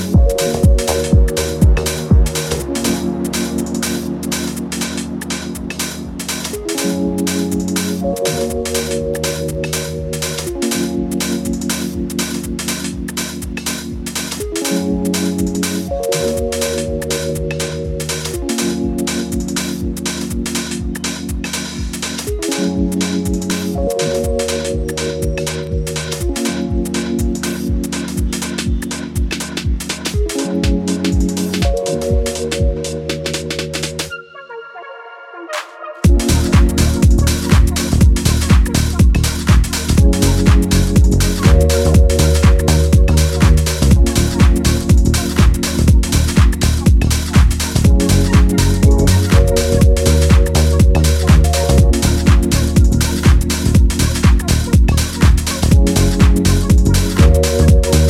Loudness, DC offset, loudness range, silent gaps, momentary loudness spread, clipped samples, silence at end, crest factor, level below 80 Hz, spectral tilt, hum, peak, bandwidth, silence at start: -15 LUFS; under 0.1%; 8 LU; none; 9 LU; under 0.1%; 0 s; 14 dB; -18 dBFS; -5 dB/octave; none; 0 dBFS; 16 kHz; 0 s